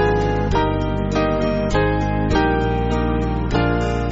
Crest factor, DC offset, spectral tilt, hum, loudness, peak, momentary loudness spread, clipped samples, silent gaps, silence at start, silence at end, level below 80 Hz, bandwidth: 14 dB; under 0.1%; -6 dB/octave; none; -19 LUFS; -4 dBFS; 3 LU; under 0.1%; none; 0 s; 0 s; -26 dBFS; 8 kHz